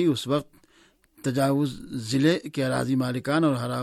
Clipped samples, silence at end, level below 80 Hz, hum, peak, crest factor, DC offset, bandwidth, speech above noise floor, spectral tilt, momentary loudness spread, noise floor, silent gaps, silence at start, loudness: under 0.1%; 0 s; -58 dBFS; none; -10 dBFS; 16 dB; under 0.1%; 15 kHz; 36 dB; -6 dB/octave; 6 LU; -60 dBFS; none; 0 s; -25 LUFS